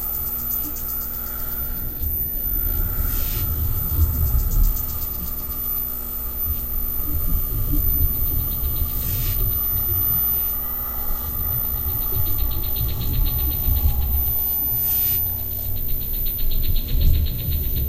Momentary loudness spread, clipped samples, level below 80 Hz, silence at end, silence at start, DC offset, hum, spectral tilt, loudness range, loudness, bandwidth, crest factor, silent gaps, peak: 6 LU; under 0.1%; -24 dBFS; 0 s; 0 s; under 0.1%; none; -5 dB/octave; 3 LU; -22 LUFS; 16.5 kHz; 16 dB; none; -6 dBFS